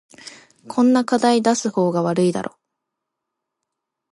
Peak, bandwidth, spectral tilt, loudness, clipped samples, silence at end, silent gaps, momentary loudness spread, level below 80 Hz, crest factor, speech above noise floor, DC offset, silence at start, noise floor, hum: -4 dBFS; 11.5 kHz; -5.5 dB/octave; -19 LUFS; under 0.1%; 1.65 s; none; 21 LU; -68 dBFS; 16 dB; 63 dB; under 0.1%; 0.25 s; -81 dBFS; none